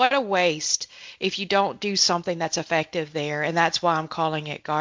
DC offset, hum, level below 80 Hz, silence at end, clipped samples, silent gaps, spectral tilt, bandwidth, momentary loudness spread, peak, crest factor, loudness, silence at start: under 0.1%; none; -66 dBFS; 0 s; under 0.1%; none; -3 dB/octave; 7.8 kHz; 7 LU; -4 dBFS; 20 dB; -23 LUFS; 0 s